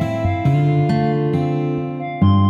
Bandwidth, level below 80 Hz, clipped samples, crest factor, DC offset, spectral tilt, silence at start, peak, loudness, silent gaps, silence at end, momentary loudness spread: 7.4 kHz; -44 dBFS; under 0.1%; 12 dB; under 0.1%; -9 dB/octave; 0 s; -4 dBFS; -18 LUFS; none; 0 s; 6 LU